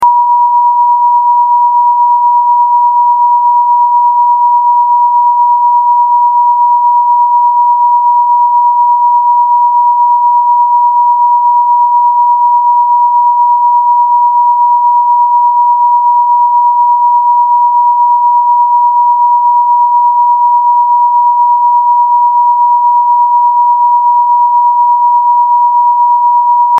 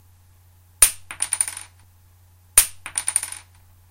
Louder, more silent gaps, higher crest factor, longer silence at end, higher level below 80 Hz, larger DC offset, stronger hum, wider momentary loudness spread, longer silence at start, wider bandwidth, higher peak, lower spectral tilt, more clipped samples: first, -7 LUFS vs -19 LUFS; neither; second, 6 dB vs 26 dB; second, 0 s vs 0.55 s; second, -76 dBFS vs -46 dBFS; neither; neither; second, 0 LU vs 15 LU; second, 0 s vs 0.8 s; second, 1.3 kHz vs 16.5 kHz; about the same, 0 dBFS vs 0 dBFS; second, 4.5 dB/octave vs 1.5 dB/octave; neither